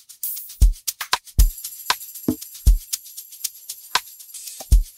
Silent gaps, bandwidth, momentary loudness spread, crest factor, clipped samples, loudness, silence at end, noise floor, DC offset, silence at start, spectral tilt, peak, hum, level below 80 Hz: none; 16.5 kHz; 12 LU; 18 dB; under 0.1%; -24 LUFS; 0.15 s; -38 dBFS; under 0.1%; 0.25 s; -3 dB/octave; -4 dBFS; none; -22 dBFS